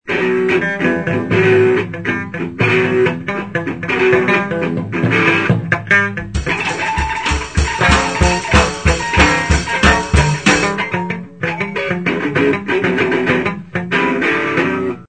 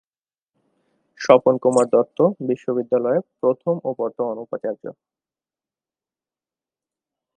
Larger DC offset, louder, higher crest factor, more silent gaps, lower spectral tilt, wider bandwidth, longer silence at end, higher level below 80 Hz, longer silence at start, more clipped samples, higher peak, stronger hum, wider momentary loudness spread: first, 0.4% vs under 0.1%; first, -15 LUFS vs -20 LUFS; second, 16 dB vs 22 dB; neither; second, -5 dB/octave vs -6.5 dB/octave; about the same, 9.2 kHz vs 9.8 kHz; second, 0.05 s vs 2.45 s; first, -26 dBFS vs -72 dBFS; second, 0.05 s vs 1.2 s; neither; about the same, 0 dBFS vs 0 dBFS; neither; second, 8 LU vs 13 LU